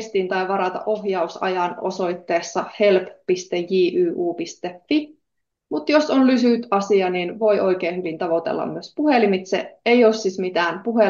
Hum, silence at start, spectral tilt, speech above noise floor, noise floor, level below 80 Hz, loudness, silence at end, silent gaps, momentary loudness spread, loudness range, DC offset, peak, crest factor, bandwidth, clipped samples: none; 0 s; -5.5 dB/octave; 58 dB; -78 dBFS; -70 dBFS; -21 LUFS; 0 s; none; 9 LU; 3 LU; under 0.1%; -4 dBFS; 16 dB; 7.4 kHz; under 0.1%